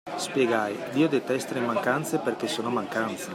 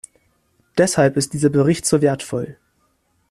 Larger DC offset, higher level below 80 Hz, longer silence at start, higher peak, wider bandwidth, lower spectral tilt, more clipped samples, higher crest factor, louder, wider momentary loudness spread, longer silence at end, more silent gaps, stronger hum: neither; second, -74 dBFS vs -54 dBFS; second, 0.05 s vs 0.75 s; second, -10 dBFS vs -2 dBFS; first, 16 kHz vs 13.5 kHz; about the same, -4.5 dB/octave vs -5 dB/octave; neither; about the same, 16 dB vs 16 dB; second, -27 LUFS vs -18 LUFS; second, 5 LU vs 11 LU; second, 0 s vs 0.8 s; neither; neither